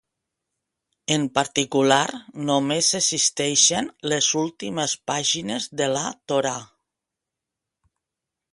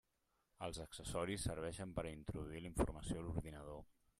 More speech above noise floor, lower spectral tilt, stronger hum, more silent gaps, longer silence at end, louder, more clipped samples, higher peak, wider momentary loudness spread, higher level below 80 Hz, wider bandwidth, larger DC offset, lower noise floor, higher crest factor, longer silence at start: first, 63 dB vs 39 dB; second, -2.5 dB/octave vs -5 dB/octave; neither; neither; first, 1.9 s vs 0.3 s; first, -21 LUFS vs -46 LUFS; neither; first, -2 dBFS vs -24 dBFS; about the same, 10 LU vs 9 LU; second, -66 dBFS vs -56 dBFS; second, 11.5 kHz vs 14.5 kHz; neither; about the same, -85 dBFS vs -84 dBFS; about the same, 22 dB vs 22 dB; first, 1.1 s vs 0.6 s